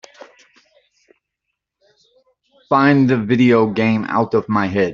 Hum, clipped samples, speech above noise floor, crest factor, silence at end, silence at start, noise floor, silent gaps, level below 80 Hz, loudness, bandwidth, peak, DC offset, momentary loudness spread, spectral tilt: none; under 0.1%; 63 dB; 16 dB; 0 s; 2.7 s; -78 dBFS; none; -56 dBFS; -15 LUFS; 7.2 kHz; -2 dBFS; under 0.1%; 5 LU; -6 dB/octave